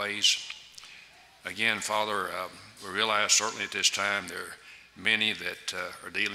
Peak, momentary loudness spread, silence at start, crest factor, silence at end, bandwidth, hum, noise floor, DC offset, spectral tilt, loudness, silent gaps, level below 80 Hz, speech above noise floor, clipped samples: -8 dBFS; 19 LU; 0 s; 22 dB; 0 s; 16 kHz; none; -54 dBFS; under 0.1%; 0 dB/octave; -27 LUFS; none; -72 dBFS; 24 dB; under 0.1%